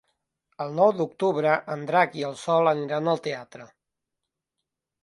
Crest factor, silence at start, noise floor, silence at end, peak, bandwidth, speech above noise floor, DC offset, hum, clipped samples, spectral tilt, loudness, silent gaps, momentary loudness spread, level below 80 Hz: 20 dB; 0.6 s; -85 dBFS; 1.4 s; -6 dBFS; 11.5 kHz; 61 dB; under 0.1%; none; under 0.1%; -6 dB/octave; -24 LUFS; none; 11 LU; -76 dBFS